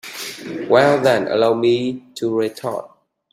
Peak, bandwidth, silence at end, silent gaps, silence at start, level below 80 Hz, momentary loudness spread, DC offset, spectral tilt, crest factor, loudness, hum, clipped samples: -2 dBFS; 16 kHz; 0.45 s; none; 0.05 s; -62 dBFS; 15 LU; under 0.1%; -5.5 dB/octave; 18 dB; -18 LUFS; none; under 0.1%